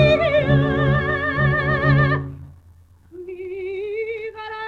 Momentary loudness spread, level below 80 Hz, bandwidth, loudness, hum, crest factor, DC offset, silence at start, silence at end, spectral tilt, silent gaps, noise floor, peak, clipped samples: 17 LU; -38 dBFS; 5.2 kHz; -20 LUFS; none; 16 dB; under 0.1%; 0 s; 0 s; -8.5 dB/octave; none; -49 dBFS; -4 dBFS; under 0.1%